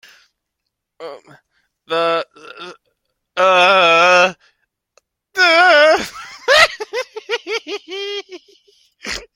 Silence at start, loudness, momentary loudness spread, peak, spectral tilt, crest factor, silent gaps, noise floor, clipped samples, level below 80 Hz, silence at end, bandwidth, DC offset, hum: 1 s; -13 LUFS; 24 LU; 0 dBFS; -1.5 dB/octave; 18 dB; none; -77 dBFS; under 0.1%; -56 dBFS; 0.15 s; 16.5 kHz; under 0.1%; none